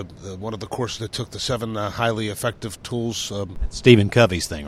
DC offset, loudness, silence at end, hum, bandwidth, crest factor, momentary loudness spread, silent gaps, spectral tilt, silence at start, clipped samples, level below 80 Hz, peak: under 0.1%; -22 LUFS; 0 s; none; 15 kHz; 22 dB; 16 LU; none; -5 dB/octave; 0 s; under 0.1%; -38 dBFS; 0 dBFS